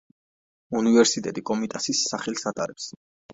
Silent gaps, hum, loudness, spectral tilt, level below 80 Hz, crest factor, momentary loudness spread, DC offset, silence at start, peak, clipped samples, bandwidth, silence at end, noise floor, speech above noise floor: 2.96-3.29 s; none; -24 LUFS; -3 dB/octave; -66 dBFS; 22 dB; 13 LU; under 0.1%; 0.7 s; -4 dBFS; under 0.1%; 8 kHz; 0 s; under -90 dBFS; over 66 dB